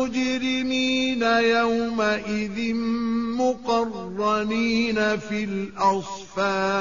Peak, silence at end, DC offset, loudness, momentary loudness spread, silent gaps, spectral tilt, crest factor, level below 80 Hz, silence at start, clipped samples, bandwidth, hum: -8 dBFS; 0 s; 0.4%; -23 LUFS; 7 LU; none; -3 dB/octave; 16 dB; -54 dBFS; 0 s; under 0.1%; 7.4 kHz; none